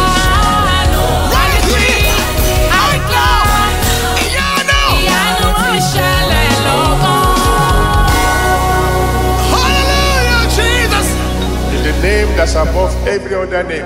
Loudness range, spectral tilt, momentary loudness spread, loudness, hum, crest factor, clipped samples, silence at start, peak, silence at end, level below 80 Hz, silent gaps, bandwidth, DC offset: 1 LU; -4 dB/octave; 4 LU; -12 LUFS; none; 10 dB; under 0.1%; 0 s; 0 dBFS; 0 s; -16 dBFS; none; 16.5 kHz; under 0.1%